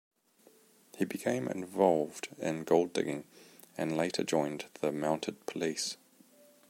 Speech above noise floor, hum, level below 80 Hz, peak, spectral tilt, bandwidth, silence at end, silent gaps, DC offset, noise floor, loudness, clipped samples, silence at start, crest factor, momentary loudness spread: 32 dB; none; -76 dBFS; -10 dBFS; -4.5 dB/octave; 16.5 kHz; 0.75 s; none; under 0.1%; -65 dBFS; -33 LUFS; under 0.1%; 0.95 s; 24 dB; 10 LU